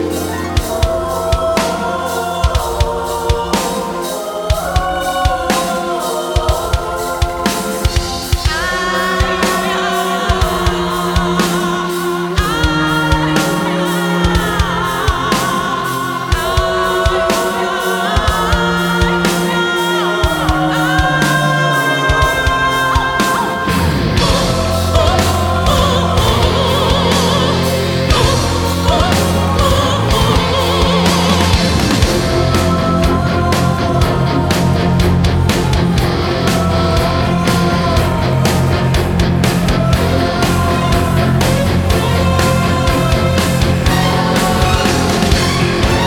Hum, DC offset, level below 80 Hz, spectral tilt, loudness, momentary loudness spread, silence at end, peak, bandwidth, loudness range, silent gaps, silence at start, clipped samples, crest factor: none; under 0.1%; -22 dBFS; -5 dB/octave; -14 LUFS; 5 LU; 0 s; 0 dBFS; 20 kHz; 4 LU; none; 0 s; under 0.1%; 14 dB